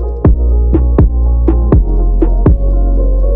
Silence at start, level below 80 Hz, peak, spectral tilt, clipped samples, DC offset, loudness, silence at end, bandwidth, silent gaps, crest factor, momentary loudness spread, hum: 0 s; -10 dBFS; 0 dBFS; -13.5 dB/octave; under 0.1%; under 0.1%; -12 LUFS; 0 s; 2.3 kHz; none; 8 dB; 3 LU; none